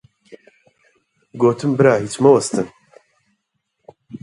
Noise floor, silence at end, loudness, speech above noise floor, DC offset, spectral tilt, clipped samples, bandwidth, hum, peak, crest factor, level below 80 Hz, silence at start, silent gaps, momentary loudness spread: -73 dBFS; 0.05 s; -16 LUFS; 58 dB; under 0.1%; -6 dB/octave; under 0.1%; 11.5 kHz; none; 0 dBFS; 20 dB; -60 dBFS; 0.3 s; none; 13 LU